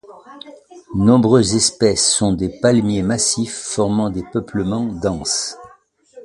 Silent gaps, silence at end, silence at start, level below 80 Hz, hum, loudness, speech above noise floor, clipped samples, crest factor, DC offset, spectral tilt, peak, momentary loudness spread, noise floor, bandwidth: none; 0 s; 0.1 s; -42 dBFS; none; -17 LUFS; 33 dB; under 0.1%; 18 dB; under 0.1%; -4.5 dB/octave; 0 dBFS; 11 LU; -50 dBFS; 11.5 kHz